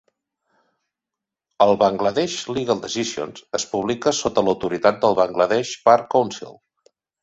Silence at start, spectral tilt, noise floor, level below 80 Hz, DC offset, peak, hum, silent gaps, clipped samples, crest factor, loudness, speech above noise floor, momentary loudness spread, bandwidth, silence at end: 1.6 s; -4 dB/octave; -86 dBFS; -58 dBFS; under 0.1%; 0 dBFS; none; none; under 0.1%; 20 dB; -20 LUFS; 66 dB; 10 LU; 8.2 kHz; 0.7 s